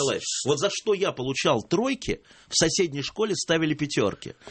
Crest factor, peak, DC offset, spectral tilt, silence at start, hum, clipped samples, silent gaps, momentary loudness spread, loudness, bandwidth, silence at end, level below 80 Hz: 18 dB; -8 dBFS; under 0.1%; -3.5 dB/octave; 0 s; none; under 0.1%; none; 6 LU; -25 LUFS; 8.8 kHz; 0 s; -52 dBFS